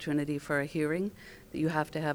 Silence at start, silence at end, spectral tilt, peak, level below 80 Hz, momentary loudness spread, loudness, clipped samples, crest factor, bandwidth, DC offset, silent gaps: 0 s; 0 s; -6.5 dB/octave; -14 dBFS; -60 dBFS; 9 LU; -32 LUFS; under 0.1%; 18 dB; over 20 kHz; under 0.1%; none